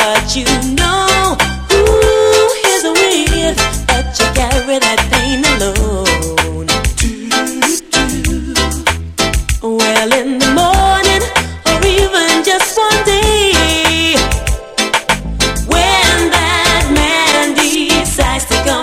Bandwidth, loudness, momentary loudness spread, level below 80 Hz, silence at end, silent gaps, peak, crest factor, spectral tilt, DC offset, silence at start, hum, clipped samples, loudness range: 16.5 kHz; -11 LUFS; 5 LU; -22 dBFS; 0 s; none; 0 dBFS; 12 dB; -3 dB/octave; under 0.1%; 0 s; none; under 0.1%; 3 LU